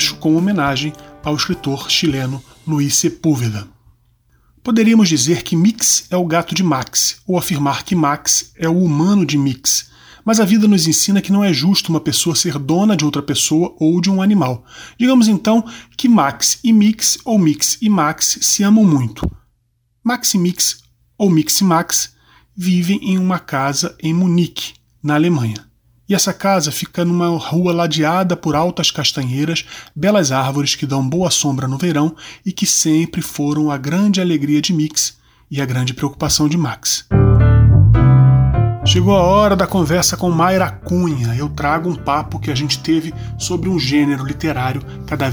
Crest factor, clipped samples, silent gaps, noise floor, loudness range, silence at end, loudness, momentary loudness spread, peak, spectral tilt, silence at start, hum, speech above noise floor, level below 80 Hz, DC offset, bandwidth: 14 dB; under 0.1%; none; -63 dBFS; 5 LU; 0 s; -15 LUFS; 9 LU; -2 dBFS; -4.5 dB/octave; 0 s; none; 48 dB; -32 dBFS; under 0.1%; over 20 kHz